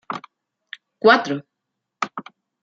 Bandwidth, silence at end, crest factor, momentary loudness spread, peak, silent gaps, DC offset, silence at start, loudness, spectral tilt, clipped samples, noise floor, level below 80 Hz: 7.6 kHz; 0.4 s; 22 dB; 25 LU; -2 dBFS; none; under 0.1%; 0.1 s; -20 LUFS; -4.5 dB/octave; under 0.1%; -80 dBFS; -72 dBFS